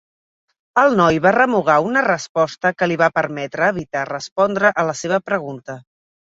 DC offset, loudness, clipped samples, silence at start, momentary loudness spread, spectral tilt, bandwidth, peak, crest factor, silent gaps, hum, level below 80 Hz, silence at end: under 0.1%; -17 LUFS; under 0.1%; 0.75 s; 10 LU; -5 dB/octave; 8 kHz; -2 dBFS; 18 dB; 2.29-2.35 s, 4.32-4.36 s; none; -56 dBFS; 0.5 s